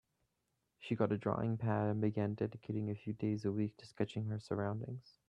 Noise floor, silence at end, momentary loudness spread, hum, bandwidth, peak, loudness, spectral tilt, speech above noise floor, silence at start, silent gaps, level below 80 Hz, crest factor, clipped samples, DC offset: -84 dBFS; 0.2 s; 7 LU; none; 8.6 kHz; -18 dBFS; -39 LUFS; -9 dB/octave; 47 dB; 0.8 s; none; -72 dBFS; 20 dB; under 0.1%; under 0.1%